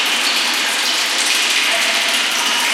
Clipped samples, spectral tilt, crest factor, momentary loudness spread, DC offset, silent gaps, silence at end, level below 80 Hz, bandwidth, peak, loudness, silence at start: under 0.1%; 2 dB/octave; 14 dB; 2 LU; under 0.1%; none; 0 s; -72 dBFS; 17 kHz; -2 dBFS; -14 LUFS; 0 s